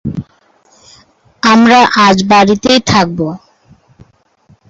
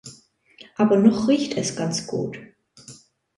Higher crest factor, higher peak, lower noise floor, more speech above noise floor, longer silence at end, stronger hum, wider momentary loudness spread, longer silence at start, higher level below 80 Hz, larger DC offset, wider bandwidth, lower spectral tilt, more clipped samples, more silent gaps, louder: second, 12 dB vs 20 dB; first, 0 dBFS vs -4 dBFS; about the same, -50 dBFS vs -52 dBFS; first, 42 dB vs 32 dB; first, 1.3 s vs 0.45 s; neither; second, 16 LU vs 23 LU; about the same, 0.05 s vs 0.05 s; first, -44 dBFS vs -62 dBFS; neither; second, 8 kHz vs 11.5 kHz; about the same, -4.5 dB/octave vs -5.5 dB/octave; neither; neither; first, -9 LUFS vs -21 LUFS